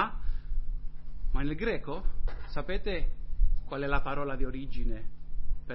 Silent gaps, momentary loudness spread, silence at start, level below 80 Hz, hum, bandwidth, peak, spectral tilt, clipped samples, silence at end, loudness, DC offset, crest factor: none; 12 LU; 0 s; -30 dBFS; none; 5.2 kHz; -12 dBFS; -5 dB/octave; under 0.1%; 0 s; -36 LUFS; under 0.1%; 14 dB